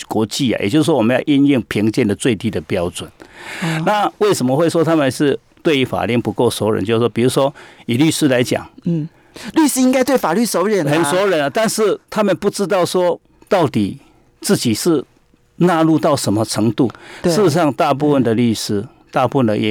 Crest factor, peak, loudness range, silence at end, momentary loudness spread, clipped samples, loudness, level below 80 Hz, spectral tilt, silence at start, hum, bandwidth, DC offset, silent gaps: 16 dB; 0 dBFS; 2 LU; 0 s; 8 LU; under 0.1%; -16 LUFS; -52 dBFS; -5.5 dB/octave; 0 s; none; 20 kHz; under 0.1%; none